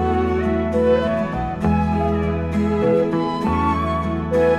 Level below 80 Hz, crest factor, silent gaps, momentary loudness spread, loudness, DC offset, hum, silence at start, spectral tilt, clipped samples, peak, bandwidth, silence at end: -32 dBFS; 12 dB; none; 4 LU; -20 LUFS; under 0.1%; none; 0 s; -8.5 dB/octave; under 0.1%; -6 dBFS; 11 kHz; 0 s